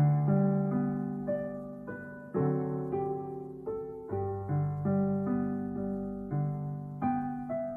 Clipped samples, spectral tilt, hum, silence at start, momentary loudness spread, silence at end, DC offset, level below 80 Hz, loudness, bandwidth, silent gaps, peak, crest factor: under 0.1%; -12.5 dB/octave; none; 0 s; 11 LU; 0 s; under 0.1%; -60 dBFS; -33 LUFS; 2.5 kHz; none; -16 dBFS; 14 dB